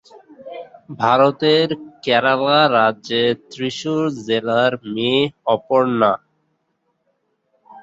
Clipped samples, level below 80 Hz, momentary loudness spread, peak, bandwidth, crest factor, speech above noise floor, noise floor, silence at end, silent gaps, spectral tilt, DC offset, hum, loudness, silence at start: under 0.1%; -62 dBFS; 12 LU; -2 dBFS; 8 kHz; 18 dB; 52 dB; -69 dBFS; 0 s; none; -5.5 dB/octave; under 0.1%; none; -17 LUFS; 0.15 s